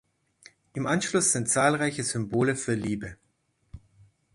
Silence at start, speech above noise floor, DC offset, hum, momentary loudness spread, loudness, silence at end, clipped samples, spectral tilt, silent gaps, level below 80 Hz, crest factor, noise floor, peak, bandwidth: 0.75 s; 45 dB; under 0.1%; none; 11 LU; -26 LUFS; 0.55 s; under 0.1%; -4 dB/octave; none; -58 dBFS; 20 dB; -71 dBFS; -8 dBFS; 11.5 kHz